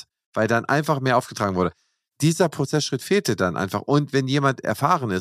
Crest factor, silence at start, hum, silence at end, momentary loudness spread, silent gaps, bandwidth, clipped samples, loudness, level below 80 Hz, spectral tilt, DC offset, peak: 18 dB; 0.35 s; none; 0 s; 5 LU; none; 15.5 kHz; under 0.1%; -22 LUFS; -60 dBFS; -5.5 dB/octave; under 0.1%; -4 dBFS